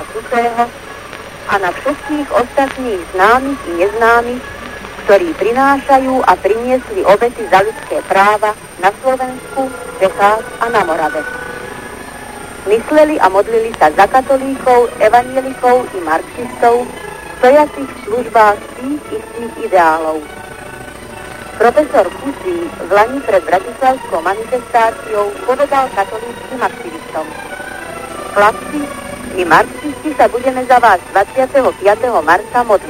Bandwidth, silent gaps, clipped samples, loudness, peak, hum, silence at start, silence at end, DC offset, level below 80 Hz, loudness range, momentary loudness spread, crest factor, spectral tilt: 16.5 kHz; none; 0.1%; -13 LUFS; 0 dBFS; none; 0 s; 0 s; under 0.1%; -42 dBFS; 5 LU; 15 LU; 14 dB; -4.5 dB/octave